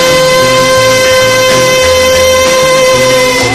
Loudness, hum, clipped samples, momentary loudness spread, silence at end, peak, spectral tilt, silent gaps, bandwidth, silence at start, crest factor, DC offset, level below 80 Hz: -6 LUFS; none; 0.9%; 0 LU; 0 s; 0 dBFS; -2.5 dB/octave; none; 14.5 kHz; 0 s; 6 dB; 0.4%; -32 dBFS